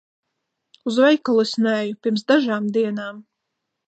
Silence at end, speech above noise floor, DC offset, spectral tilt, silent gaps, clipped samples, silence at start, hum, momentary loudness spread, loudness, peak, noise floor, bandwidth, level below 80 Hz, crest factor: 0.65 s; 59 dB; under 0.1%; -5.5 dB/octave; none; under 0.1%; 0.85 s; none; 11 LU; -20 LUFS; -4 dBFS; -79 dBFS; 8.8 kHz; -78 dBFS; 16 dB